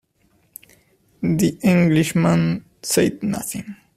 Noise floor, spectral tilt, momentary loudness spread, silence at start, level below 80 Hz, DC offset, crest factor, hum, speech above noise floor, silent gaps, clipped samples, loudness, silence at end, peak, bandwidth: -62 dBFS; -5.5 dB/octave; 11 LU; 1.2 s; -52 dBFS; under 0.1%; 18 dB; none; 43 dB; none; under 0.1%; -19 LUFS; 0.25 s; -4 dBFS; 15.5 kHz